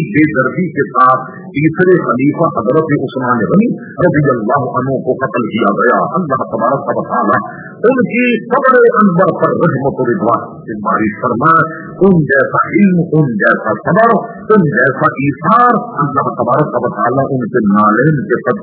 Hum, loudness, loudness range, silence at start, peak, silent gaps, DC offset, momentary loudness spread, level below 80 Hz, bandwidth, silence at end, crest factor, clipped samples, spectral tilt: none; -12 LUFS; 2 LU; 0 s; 0 dBFS; none; under 0.1%; 6 LU; -48 dBFS; 4 kHz; 0 s; 12 dB; 0.3%; -11.5 dB/octave